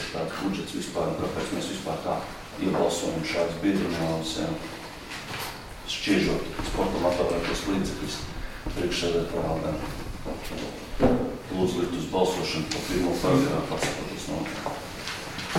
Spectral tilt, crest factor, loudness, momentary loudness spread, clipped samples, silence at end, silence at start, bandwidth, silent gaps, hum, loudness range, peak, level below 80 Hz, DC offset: -5 dB/octave; 20 dB; -28 LUFS; 11 LU; under 0.1%; 0 s; 0 s; 16.5 kHz; none; none; 3 LU; -8 dBFS; -42 dBFS; under 0.1%